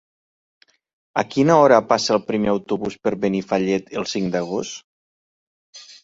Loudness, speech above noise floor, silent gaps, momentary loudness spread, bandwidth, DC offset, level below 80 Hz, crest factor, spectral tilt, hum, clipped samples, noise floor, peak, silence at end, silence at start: -20 LUFS; over 71 dB; 4.84-5.73 s; 12 LU; 8 kHz; under 0.1%; -58 dBFS; 20 dB; -5 dB/octave; none; under 0.1%; under -90 dBFS; -2 dBFS; 0.1 s; 1.15 s